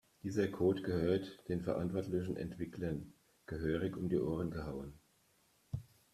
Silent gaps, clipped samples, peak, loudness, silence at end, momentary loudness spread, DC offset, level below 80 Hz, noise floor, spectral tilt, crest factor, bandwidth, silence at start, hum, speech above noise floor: none; under 0.1%; -20 dBFS; -39 LUFS; 0.3 s; 13 LU; under 0.1%; -60 dBFS; -73 dBFS; -8 dB/octave; 18 dB; 14 kHz; 0.25 s; none; 35 dB